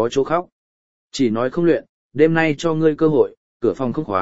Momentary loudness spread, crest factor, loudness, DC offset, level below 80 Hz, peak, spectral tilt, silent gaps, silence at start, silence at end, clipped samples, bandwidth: 7 LU; 18 dB; -19 LUFS; 0.9%; -52 dBFS; 0 dBFS; -6.5 dB/octave; 0.52-1.10 s, 1.89-2.10 s, 3.37-3.60 s; 0 s; 0 s; under 0.1%; 8 kHz